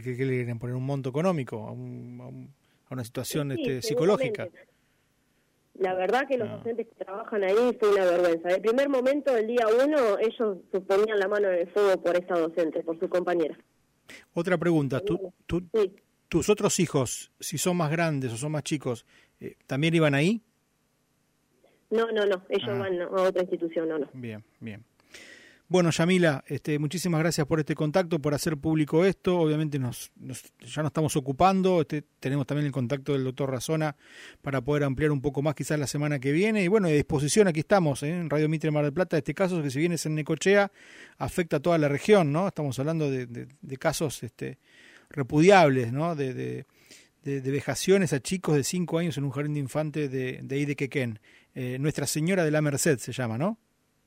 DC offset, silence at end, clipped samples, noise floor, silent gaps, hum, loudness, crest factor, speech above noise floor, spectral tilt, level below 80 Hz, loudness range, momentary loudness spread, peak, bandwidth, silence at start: under 0.1%; 0.5 s; under 0.1%; -71 dBFS; none; none; -26 LUFS; 20 dB; 45 dB; -5.5 dB/octave; -58 dBFS; 5 LU; 14 LU; -6 dBFS; 16 kHz; 0 s